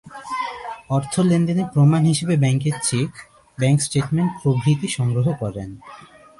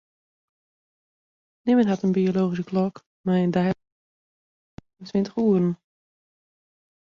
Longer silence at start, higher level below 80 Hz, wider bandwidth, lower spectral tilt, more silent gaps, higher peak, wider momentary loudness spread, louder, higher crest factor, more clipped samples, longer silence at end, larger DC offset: second, 0.05 s vs 1.65 s; first, -52 dBFS vs -64 dBFS; first, 11.5 kHz vs 7 kHz; second, -6 dB/octave vs -8.5 dB/octave; second, none vs 3.06-3.24 s, 3.92-4.78 s; first, -6 dBFS vs -10 dBFS; about the same, 12 LU vs 11 LU; first, -20 LUFS vs -24 LUFS; about the same, 14 dB vs 16 dB; neither; second, 0.35 s vs 1.45 s; neither